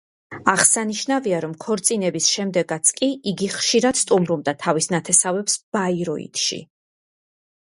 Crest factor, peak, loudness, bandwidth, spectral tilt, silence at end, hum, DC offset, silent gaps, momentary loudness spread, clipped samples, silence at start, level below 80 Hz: 22 dB; 0 dBFS; -19 LUFS; 11.5 kHz; -2.5 dB/octave; 1 s; none; under 0.1%; 5.63-5.72 s; 9 LU; under 0.1%; 0.3 s; -64 dBFS